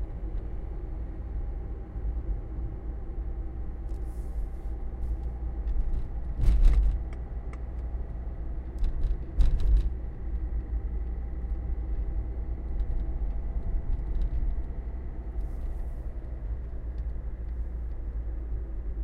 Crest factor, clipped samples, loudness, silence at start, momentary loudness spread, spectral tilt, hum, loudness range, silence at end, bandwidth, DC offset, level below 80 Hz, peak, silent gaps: 20 dB; under 0.1%; -35 LUFS; 0 s; 10 LU; -9 dB/octave; none; 6 LU; 0 s; 4.2 kHz; under 0.1%; -30 dBFS; -10 dBFS; none